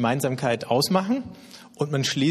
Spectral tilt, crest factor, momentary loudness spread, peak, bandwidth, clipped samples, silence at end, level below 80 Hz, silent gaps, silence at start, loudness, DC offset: -5 dB/octave; 18 dB; 19 LU; -6 dBFS; 13.5 kHz; under 0.1%; 0 s; -62 dBFS; none; 0 s; -24 LUFS; under 0.1%